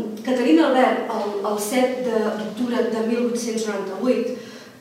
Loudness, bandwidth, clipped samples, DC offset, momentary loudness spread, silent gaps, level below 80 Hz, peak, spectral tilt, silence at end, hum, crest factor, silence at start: -21 LUFS; 16 kHz; under 0.1%; under 0.1%; 9 LU; none; -78 dBFS; -6 dBFS; -4.5 dB/octave; 0 s; none; 16 dB; 0 s